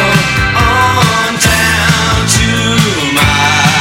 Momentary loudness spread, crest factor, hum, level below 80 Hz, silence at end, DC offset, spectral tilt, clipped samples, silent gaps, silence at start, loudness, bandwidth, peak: 2 LU; 10 dB; none; -24 dBFS; 0 s; under 0.1%; -3.5 dB/octave; 0.1%; none; 0 s; -9 LUFS; 17 kHz; 0 dBFS